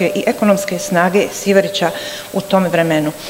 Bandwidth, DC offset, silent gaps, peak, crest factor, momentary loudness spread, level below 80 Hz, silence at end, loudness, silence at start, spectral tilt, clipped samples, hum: 16.5 kHz; under 0.1%; none; 0 dBFS; 16 dB; 6 LU; -54 dBFS; 0 s; -15 LUFS; 0 s; -5 dB/octave; 0.1%; none